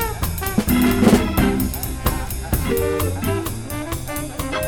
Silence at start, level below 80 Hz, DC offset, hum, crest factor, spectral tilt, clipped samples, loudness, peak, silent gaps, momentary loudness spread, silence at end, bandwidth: 0 s; -30 dBFS; under 0.1%; none; 18 dB; -5.5 dB/octave; under 0.1%; -20 LUFS; -2 dBFS; none; 11 LU; 0 s; over 20 kHz